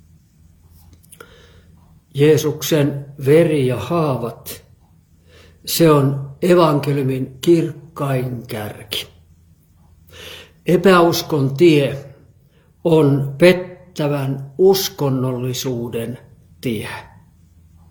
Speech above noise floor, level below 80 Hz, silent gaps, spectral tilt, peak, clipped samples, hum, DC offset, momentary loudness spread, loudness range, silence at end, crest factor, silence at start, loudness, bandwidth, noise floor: 36 dB; -52 dBFS; none; -6 dB/octave; 0 dBFS; under 0.1%; none; under 0.1%; 18 LU; 5 LU; 0.85 s; 18 dB; 2.15 s; -17 LUFS; 19 kHz; -52 dBFS